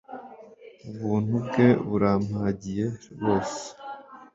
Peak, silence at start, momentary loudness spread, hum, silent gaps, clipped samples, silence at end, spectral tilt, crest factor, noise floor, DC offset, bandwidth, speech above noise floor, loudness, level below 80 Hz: -6 dBFS; 0.1 s; 22 LU; none; none; under 0.1%; 0.1 s; -7 dB/octave; 20 dB; -48 dBFS; under 0.1%; 7.8 kHz; 23 dB; -26 LUFS; -54 dBFS